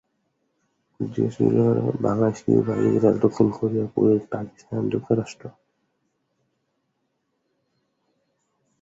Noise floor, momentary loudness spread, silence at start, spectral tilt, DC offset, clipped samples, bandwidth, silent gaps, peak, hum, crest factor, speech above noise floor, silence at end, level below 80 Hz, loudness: -74 dBFS; 13 LU; 1 s; -9 dB/octave; under 0.1%; under 0.1%; 7.8 kHz; none; -4 dBFS; none; 20 dB; 53 dB; 3.3 s; -58 dBFS; -22 LUFS